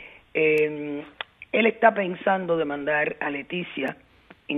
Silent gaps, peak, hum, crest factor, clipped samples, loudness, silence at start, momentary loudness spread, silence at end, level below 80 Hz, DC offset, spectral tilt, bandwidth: none; -2 dBFS; none; 22 dB; under 0.1%; -24 LUFS; 0 s; 12 LU; 0 s; -66 dBFS; under 0.1%; -7 dB/octave; 4 kHz